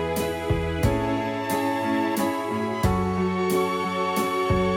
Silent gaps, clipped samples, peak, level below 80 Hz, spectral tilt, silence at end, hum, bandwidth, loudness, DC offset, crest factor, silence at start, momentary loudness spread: none; under 0.1%; -8 dBFS; -38 dBFS; -6 dB/octave; 0 s; none; 17 kHz; -25 LUFS; under 0.1%; 16 dB; 0 s; 3 LU